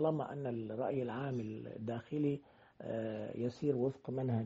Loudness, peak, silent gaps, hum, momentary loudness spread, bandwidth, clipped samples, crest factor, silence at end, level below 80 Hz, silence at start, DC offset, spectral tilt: -39 LUFS; -22 dBFS; none; none; 8 LU; 7.6 kHz; under 0.1%; 16 dB; 0 s; -74 dBFS; 0 s; under 0.1%; -8 dB/octave